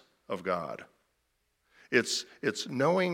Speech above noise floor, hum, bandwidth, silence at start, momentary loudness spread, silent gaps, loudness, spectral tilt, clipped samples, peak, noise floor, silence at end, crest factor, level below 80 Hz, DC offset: 47 dB; none; 16.5 kHz; 0.3 s; 13 LU; none; -31 LUFS; -4 dB/octave; under 0.1%; -10 dBFS; -77 dBFS; 0 s; 24 dB; -78 dBFS; under 0.1%